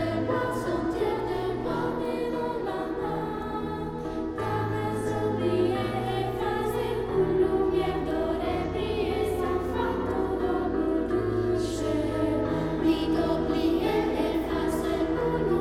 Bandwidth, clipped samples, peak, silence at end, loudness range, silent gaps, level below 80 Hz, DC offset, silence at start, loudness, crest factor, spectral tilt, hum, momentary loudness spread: 15 kHz; under 0.1%; -12 dBFS; 0 s; 4 LU; none; -42 dBFS; under 0.1%; 0 s; -28 LUFS; 14 dB; -7 dB/octave; none; 5 LU